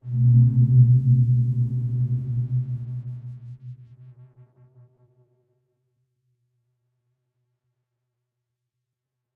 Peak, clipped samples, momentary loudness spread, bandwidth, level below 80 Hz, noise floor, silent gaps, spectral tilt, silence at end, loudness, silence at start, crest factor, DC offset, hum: -6 dBFS; under 0.1%; 23 LU; 0.7 kHz; -54 dBFS; -83 dBFS; none; -13 dB/octave; 5.25 s; -20 LUFS; 0.05 s; 18 dB; under 0.1%; none